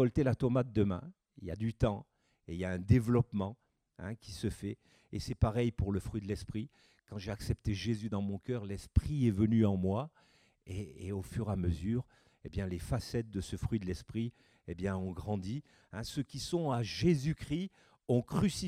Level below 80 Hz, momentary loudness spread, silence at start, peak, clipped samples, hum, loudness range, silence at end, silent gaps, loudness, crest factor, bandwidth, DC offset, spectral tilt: -50 dBFS; 15 LU; 0 s; -14 dBFS; under 0.1%; none; 5 LU; 0 s; none; -35 LUFS; 22 dB; 14.5 kHz; under 0.1%; -7 dB/octave